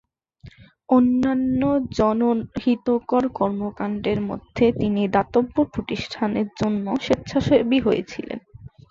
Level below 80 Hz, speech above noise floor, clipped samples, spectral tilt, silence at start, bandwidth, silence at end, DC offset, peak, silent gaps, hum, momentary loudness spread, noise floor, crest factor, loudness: -48 dBFS; 26 dB; under 0.1%; -7 dB/octave; 0.45 s; 7.4 kHz; 0.25 s; under 0.1%; -4 dBFS; none; none; 8 LU; -47 dBFS; 16 dB; -22 LUFS